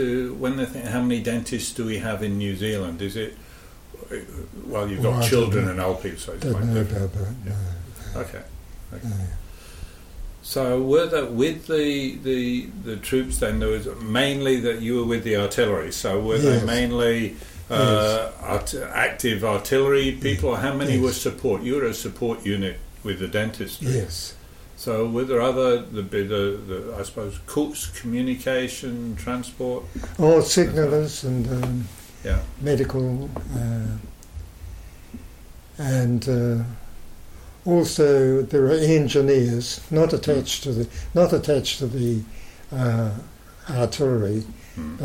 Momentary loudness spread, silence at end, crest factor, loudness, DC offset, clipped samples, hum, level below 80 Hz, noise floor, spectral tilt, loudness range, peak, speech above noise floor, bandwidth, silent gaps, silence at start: 16 LU; 0 s; 18 dB; -23 LUFS; under 0.1%; under 0.1%; none; -40 dBFS; -43 dBFS; -5.5 dB/octave; 8 LU; -6 dBFS; 21 dB; 16.5 kHz; none; 0 s